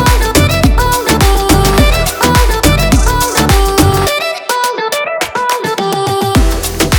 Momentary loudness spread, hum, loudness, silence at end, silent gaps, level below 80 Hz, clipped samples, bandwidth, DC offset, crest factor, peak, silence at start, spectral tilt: 5 LU; none; -11 LUFS; 0 s; none; -16 dBFS; 0.2%; over 20 kHz; under 0.1%; 10 dB; 0 dBFS; 0 s; -4.5 dB/octave